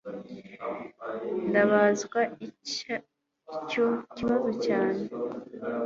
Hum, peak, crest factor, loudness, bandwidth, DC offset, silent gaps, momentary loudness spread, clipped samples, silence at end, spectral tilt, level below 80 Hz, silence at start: none; -8 dBFS; 20 dB; -29 LUFS; 7.8 kHz; under 0.1%; none; 16 LU; under 0.1%; 0 s; -5 dB/octave; -66 dBFS; 0.05 s